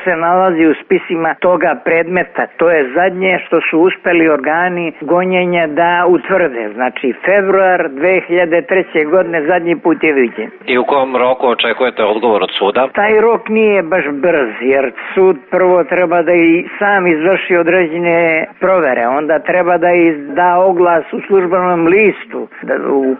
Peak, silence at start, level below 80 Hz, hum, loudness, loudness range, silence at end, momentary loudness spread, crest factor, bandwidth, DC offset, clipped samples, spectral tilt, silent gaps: 0 dBFS; 0 s; -54 dBFS; none; -12 LUFS; 1 LU; 0 s; 5 LU; 10 dB; 4.2 kHz; under 0.1%; under 0.1%; -3.5 dB/octave; none